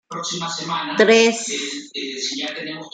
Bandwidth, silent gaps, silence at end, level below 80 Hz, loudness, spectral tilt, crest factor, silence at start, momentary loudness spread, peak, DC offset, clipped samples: 9.4 kHz; none; 0.05 s; -70 dBFS; -20 LUFS; -2.5 dB/octave; 20 dB; 0.1 s; 14 LU; 0 dBFS; under 0.1%; under 0.1%